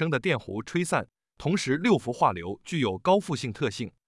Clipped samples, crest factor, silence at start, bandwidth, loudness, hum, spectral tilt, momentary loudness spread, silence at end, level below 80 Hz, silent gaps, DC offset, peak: under 0.1%; 18 dB; 0 s; 12 kHz; -27 LUFS; none; -5.5 dB/octave; 9 LU; 0.2 s; -62 dBFS; none; under 0.1%; -8 dBFS